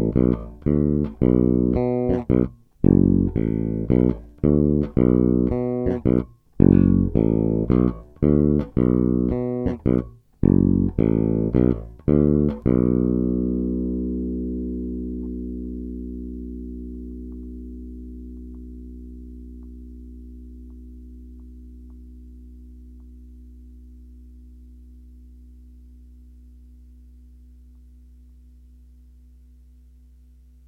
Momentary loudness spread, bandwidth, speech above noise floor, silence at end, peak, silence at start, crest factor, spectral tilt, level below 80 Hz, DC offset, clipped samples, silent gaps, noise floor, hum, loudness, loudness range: 23 LU; 3.4 kHz; 29 dB; 4.9 s; 0 dBFS; 0 s; 22 dB; -12.5 dB/octave; -34 dBFS; under 0.1%; under 0.1%; none; -49 dBFS; none; -21 LUFS; 21 LU